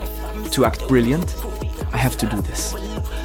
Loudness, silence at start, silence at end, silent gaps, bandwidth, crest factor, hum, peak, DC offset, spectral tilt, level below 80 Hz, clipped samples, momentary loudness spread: -22 LUFS; 0 s; 0 s; none; 18.5 kHz; 18 dB; none; -2 dBFS; under 0.1%; -5.5 dB/octave; -28 dBFS; under 0.1%; 11 LU